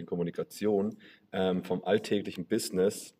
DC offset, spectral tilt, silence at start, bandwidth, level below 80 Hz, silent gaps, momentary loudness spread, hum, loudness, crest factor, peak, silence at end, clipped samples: under 0.1%; -5.5 dB/octave; 0 s; 16 kHz; -72 dBFS; none; 6 LU; none; -31 LUFS; 18 dB; -14 dBFS; 0.1 s; under 0.1%